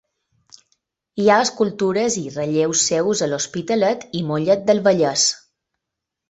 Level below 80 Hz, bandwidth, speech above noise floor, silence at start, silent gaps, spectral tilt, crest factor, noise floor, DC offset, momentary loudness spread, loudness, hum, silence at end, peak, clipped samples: -62 dBFS; 8.4 kHz; 64 dB; 1.15 s; none; -3.5 dB/octave; 18 dB; -82 dBFS; under 0.1%; 8 LU; -19 LUFS; none; 0.95 s; -2 dBFS; under 0.1%